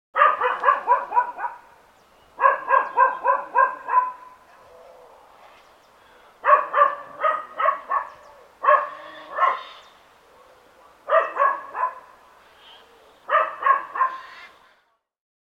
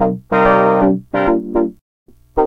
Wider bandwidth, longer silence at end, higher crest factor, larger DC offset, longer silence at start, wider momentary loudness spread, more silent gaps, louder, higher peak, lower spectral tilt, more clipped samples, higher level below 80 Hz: first, 7.4 kHz vs 5.8 kHz; first, 0.95 s vs 0 s; first, 22 dB vs 16 dB; neither; first, 0.15 s vs 0 s; first, 15 LU vs 9 LU; second, none vs 1.81-2.06 s; second, -21 LUFS vs -15 LUFS; about the same, -2 dBFS vs 0 dBFS; second, -2.5 dB/octave vs -9 dB/octave; neither; second, -72 dBFS vs -36 dBFS